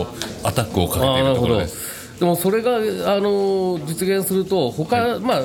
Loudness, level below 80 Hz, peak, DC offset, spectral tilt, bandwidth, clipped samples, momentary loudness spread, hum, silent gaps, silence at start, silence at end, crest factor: -20 LUFS; -42 dBFS; -4 dBFS; under 0.1%; -5 dB/octave; 18 kHz; under 0.1%; 6 LU; none; none; 0 s; 0 s; 16 dB